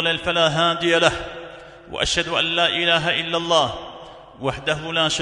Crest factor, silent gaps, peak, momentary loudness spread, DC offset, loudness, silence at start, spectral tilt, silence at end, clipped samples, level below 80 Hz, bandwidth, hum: 20 dB; none; -2 dBFS; 17 LU; under 0.1%; -19 LUFS; 0 s; -3 dB/octave; 0 s; under 0.1%; -46 dBFS; 11 kHz; none